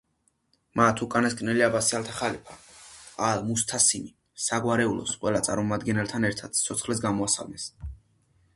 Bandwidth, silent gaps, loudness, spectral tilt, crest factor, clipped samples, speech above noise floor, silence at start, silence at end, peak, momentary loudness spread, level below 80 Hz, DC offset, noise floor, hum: 12 kHz; none; -26 LUFS; -3.5 dB/octave; 22 dB; under 0.1%; 45 dB; 0.75 s; 0.6 s; -4 dBFS; 17 LU; -52 dBFS; under 0.1%; -72 dBFS; none